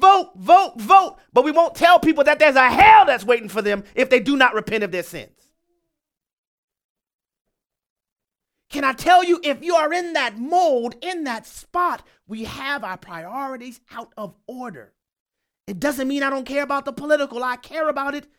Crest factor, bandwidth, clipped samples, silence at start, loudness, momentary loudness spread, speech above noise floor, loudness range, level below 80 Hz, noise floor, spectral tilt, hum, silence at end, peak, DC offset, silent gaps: 18 dB; 17 kHz; under 0.1%; 0 s; -18 LUFS; 20 LU; 63 dB; 17 LU; -52 dBFS; -82 dBFS; -4 dB/octave; none; 0.15 s; 0 dBFS; under 0.1%; 6.33-6.68 s, 6.84-6.96 s, 7.14-7.19 s, 7.41-7.45 s, 7.90-7.96 s, 8.12-8.16 s, 15.20-15.26 s